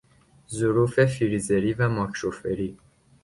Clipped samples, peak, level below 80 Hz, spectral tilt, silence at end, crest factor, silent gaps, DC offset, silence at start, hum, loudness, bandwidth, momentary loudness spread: under 0.1%; -6 dBFS; -52 dBFS; -6.5 dB/octave; 0.5 s; 18 dB; none; under 0.1%; 0.5 s; none; -25 LUFS; 11.5 kHz; 9 LU